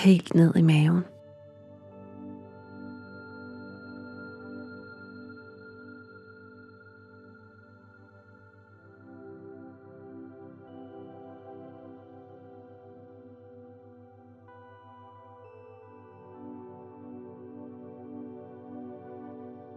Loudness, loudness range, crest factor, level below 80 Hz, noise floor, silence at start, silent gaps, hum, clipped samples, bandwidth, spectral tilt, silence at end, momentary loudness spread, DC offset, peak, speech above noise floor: -27 LUFS; 16 LU; 24 dB; -78 dBFS; -54 dBFS; 0 s; none; none; under 0.1%; 11.5 kHz; -8 dB/octave; 0 s; 20 LU; under 0.1%; -8 dBFS; 34 dB